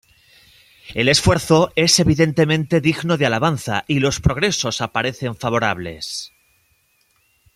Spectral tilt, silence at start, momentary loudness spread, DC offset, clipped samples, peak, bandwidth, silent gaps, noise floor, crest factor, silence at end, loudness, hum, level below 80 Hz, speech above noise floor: -4.5 dB/octave; 0.85 s; 12 LU; under 0.1%; under 0.1%; -2 dBFS; 15.5 kHz; none; -62 dBFS; 18 dB; 1.3 s; -18 LUFS; none; -40 dBFS; 44 dB